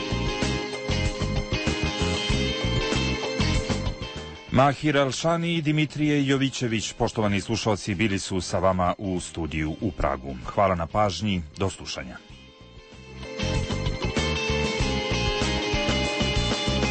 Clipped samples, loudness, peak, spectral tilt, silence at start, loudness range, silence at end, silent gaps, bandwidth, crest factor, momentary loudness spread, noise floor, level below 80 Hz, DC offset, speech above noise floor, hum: under 0.1%; -25 LUFS; -10 dBFS; -5 dB/octave; 0 s; 4 LU; 0 s; none; 8.8 kHz; 16 dB; 7 LU; -47 dBFS; -36 dBFS; under 0.1%; 22 dB; none